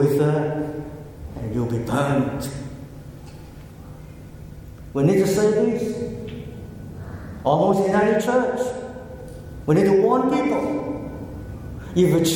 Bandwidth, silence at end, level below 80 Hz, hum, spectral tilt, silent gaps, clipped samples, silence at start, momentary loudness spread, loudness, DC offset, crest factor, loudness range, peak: 17.5 kHz; 0 s; -44 dBFS; none; -6.5 dB/octave; none; under 0.1%; 0 s; 22 LU; -21 LUFS; under 0.1%; 18 dB; 7 LU; -4 dBFS